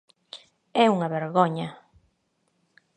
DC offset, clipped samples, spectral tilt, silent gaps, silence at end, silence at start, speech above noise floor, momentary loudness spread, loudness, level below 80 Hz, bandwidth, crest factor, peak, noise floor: under 0.1%; under 0.1%; -6.5 dB/octave; none; 1.2 s; 0.35 s; 49 dB; 23 LU; -24 LUFS; -72 dBFS; 9.6 kHz; 22 dB; -4 dBFS; -72 dBFS